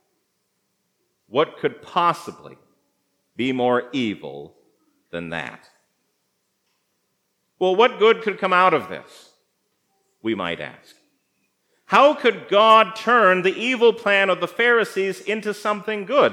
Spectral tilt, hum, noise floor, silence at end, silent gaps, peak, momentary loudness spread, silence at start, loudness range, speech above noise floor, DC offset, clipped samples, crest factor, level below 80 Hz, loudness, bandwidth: -4.5 dB/octave; none; -72 dBFS; 0 s; none; 0 dBFS; 16 LU; 1.35 s; 13 LU; 52 dB; under 0.1%; under 0.1%; 22 dB; -74 dBFS; -19 LUFS; 14 kHz